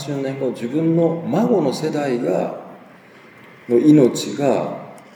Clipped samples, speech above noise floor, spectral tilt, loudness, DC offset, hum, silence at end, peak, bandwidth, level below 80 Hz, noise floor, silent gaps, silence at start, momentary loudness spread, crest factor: under 0.1%; 27 dB; -7 dB/octave; -18 LUFS; under 0.1%; none; 0.15 s; -2 dBFS; 14.5 kHz; -74 dBFS; -45 dBFS; none; 0 s; 12 LU; 18 dB